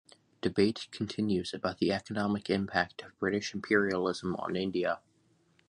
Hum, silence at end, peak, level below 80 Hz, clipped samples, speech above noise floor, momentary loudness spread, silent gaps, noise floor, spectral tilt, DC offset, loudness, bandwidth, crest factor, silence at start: none; 0.7 s; -10 dBFS; -62 dBFS; under 0.1%; 38 dB; 7 LU; none; -69 dBFS; -5.5 dB/octave; under 0.1%; -32 LUFS; 10.5 kHz; 22 dB; 0.45 s